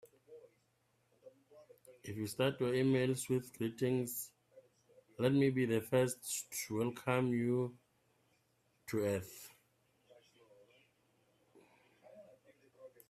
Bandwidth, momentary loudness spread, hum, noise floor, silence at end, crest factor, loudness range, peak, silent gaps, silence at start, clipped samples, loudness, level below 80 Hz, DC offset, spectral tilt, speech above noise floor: 15.5 kHz; 15 LU; none; -77 dBFS; 0.2 s; 20 dB; 10 LU; -18 dBFS; none; 0.3 s; under 0.1%; -36 LUFS; -76 dBFS; under 0.1%; -5.5 dB/octave; 42 dB